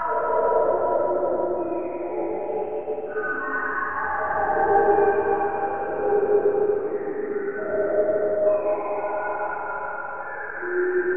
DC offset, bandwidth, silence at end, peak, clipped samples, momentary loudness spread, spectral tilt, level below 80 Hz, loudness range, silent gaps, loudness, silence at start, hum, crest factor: 1%; 3.3 kHz; 0 s; -8 dBFS; under 0.1%; 9 LU; -10 dB/octave; -56 dBFS; 4 LU; none; -24 LUFS; 0 s; none; 16 dB